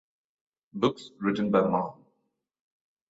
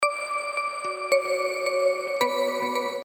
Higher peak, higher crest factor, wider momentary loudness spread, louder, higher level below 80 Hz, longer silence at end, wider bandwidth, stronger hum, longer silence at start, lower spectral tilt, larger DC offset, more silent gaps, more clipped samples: about the same, -10 dBFS vs -8 dBFS; about the same, 20 dB vs 18 dB; first, 11 LU vs 5 LU; about the same, -28 LUFS vs -26 LUFS; first, -68 dBFS vs -88 dBFS; first, 1.15 s vs 0 s; second, 8 kHz vs 18 kHz; neither; first, 0.75 s vs 0 s; first, -7 dB/octave vs -1.5 dB/octave; neither; neither; neither